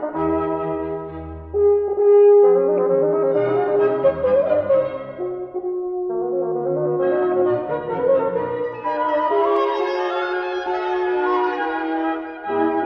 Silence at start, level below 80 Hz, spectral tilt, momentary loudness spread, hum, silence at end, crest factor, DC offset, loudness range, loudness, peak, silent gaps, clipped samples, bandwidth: 0 s; -50 dBFS; -8 dB/octave; 11 LU; none; 0 s; 14 dB; under 0.1%; 5 LU; -20 LUFS; -6 dBFS; none; under 0.1%; 5.8 kHz